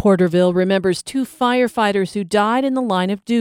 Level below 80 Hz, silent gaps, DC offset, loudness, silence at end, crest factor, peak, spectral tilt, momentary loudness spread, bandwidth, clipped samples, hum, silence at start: -58 dBFS; none; under 0.1%; -18 LUFS; 0 s; 14 dB; -2 dBFS; -6 dB/octave; 5 LU; 16 kHz; under 0.1%; none; 0 s